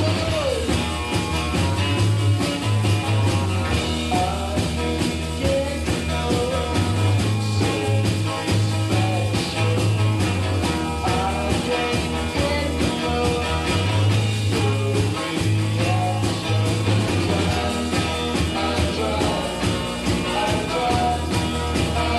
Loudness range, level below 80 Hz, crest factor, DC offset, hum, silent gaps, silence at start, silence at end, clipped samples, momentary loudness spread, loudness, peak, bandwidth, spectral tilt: 1 LU; -34 dBFS; 14 dB; under 0.1%; none; none; 0 s; 0 s; under 0.1%; 3 LU; -22 LUFS; -6 dBFS; 13.5 kHz; -5.5 dB/octave